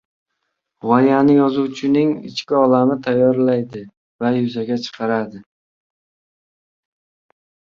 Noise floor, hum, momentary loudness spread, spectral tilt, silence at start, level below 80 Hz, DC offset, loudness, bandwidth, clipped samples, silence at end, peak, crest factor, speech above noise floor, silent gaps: -75 dBFS; none; 11 LU; -7.5 dB/octave; 0.85 s; -62 dBFS; under 0.1%; -17 LUFS; 7.2 kHz; under 0.1%; 2.35 s; -2 dBFS; 18 dB; 59 dB; 3.97-4.19 s